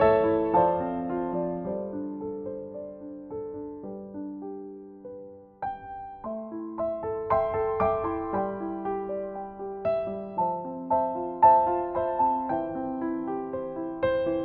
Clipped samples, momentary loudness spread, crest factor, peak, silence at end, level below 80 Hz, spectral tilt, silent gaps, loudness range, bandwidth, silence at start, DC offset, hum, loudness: under 0.1%; 16 LU; 20 dB; -8 dBFS; 0 s; -54 dBFS; -6.5 dB/octave; none; 13 LU; 4.6 kHz; 0 s; under 0.1%; none; -28 LUFS